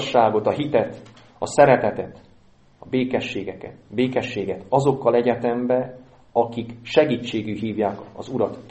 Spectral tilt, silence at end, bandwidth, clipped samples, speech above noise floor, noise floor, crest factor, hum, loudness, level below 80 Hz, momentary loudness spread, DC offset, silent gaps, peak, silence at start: -6 dB/octave; 0 s; 8.4 kHz; under 0.1%; 32 dB; -53 dBFS; 22 dB; none; -22 LUFS; -58 dBFS; 14 LU; under 0.1%; none; 0 dBFS; 0 s